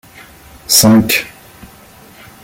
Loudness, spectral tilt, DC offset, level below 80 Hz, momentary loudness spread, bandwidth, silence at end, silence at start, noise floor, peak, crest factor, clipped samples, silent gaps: -10 LUFS; -3 dB/octave; under 0.1%; -46 dBFS; 23 LU; 17 kHz; 1.15 s; 0.7 s; -40 dBFS; 0 dBFS; 16 dB; under 0.1%; none